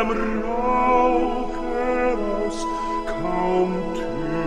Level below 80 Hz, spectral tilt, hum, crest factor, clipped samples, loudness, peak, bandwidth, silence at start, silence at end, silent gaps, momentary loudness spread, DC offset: -34 dBFS; -6 dB/octave; none; 14 dB; under 0.1%; -23 LUFS; -8 dBFS; 10.5 kHz; 0 s; 0 s; none; 8 LU; under 0.1%